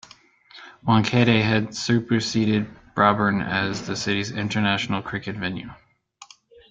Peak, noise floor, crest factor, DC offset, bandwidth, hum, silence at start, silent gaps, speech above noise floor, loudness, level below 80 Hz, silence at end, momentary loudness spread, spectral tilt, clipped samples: -2 dBFS; -52 dBFS; 22 dB; under 0.1%; 7.8 kHz; none; 0.55 s; none; 30 dB; -22 LUFS; -54 dBFS; 0.45 s; 12 LU; -5.5 dB/octave; under 0.1%